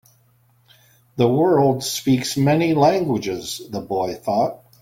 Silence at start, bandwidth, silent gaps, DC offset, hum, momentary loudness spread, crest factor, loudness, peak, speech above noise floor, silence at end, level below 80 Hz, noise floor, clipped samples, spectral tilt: 1.15 s; 17 kHz; none; under 0.1%; none; 11 LU; 16 dB; -20 LUFS; -4 dBFS; 39 dB; 0.25 s; -56 dBFS; -58 dBFS; under 0.1%; -5.5 dB/octave